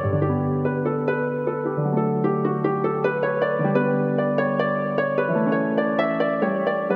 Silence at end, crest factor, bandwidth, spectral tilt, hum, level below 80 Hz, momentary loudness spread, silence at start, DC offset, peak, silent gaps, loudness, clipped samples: 0 s; 14 dB; 5.2 kHz; -10 dB/octave; none; -64 dBFS; 2 LU; 0 s; under 0.1%; -8 dBFS; none; -22 LUFS; under 0.1%